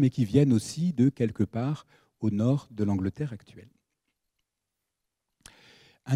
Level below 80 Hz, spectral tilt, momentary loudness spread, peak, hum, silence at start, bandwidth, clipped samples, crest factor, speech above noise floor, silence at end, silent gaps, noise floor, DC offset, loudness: -62 dBFS; -8 dB/octave; 13 LU; -8 dBFS; none; 0 s; 12.5 kHz; under 0.1%; 20 dB; 58 dB; 0 s; none; -85 dBFS; under 0.1%; -27 LUFS